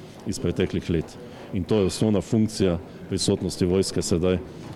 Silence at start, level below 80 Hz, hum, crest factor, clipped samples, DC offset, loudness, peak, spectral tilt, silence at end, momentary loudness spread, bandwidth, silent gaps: 0 s; -48 dBFS; none; 16 dB; under 0.1%; under 0.1%; -25 LUFS; -10 dBFS; -5.5 dB/octave; 0 s; 9 LU; 14 kHz; none